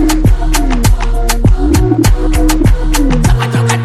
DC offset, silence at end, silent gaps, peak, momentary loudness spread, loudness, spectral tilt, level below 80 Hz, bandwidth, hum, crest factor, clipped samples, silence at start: under 0.1%; 0 s; none; 0 dBFS; 3 LU; -12 LUFS; -5.5 dB/octave; -12 dBFS; 14.5 kHz; none; 8 dB; under 0.1%; 0 s